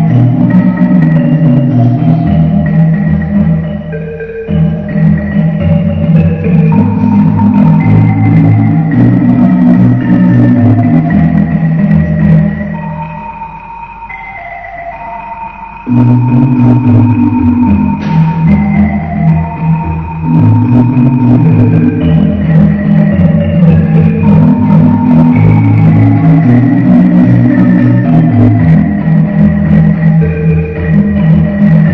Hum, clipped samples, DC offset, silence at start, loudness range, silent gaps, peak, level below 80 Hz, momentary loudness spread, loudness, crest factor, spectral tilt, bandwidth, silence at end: none; 5%; under 0.1%; 0 s; 5 LU; none; 0 dBFS; -28 dBFS; 12 LU; -7 LUFS; 6 dB; -11.5 dB/octave; 3.7 kHz; 0 s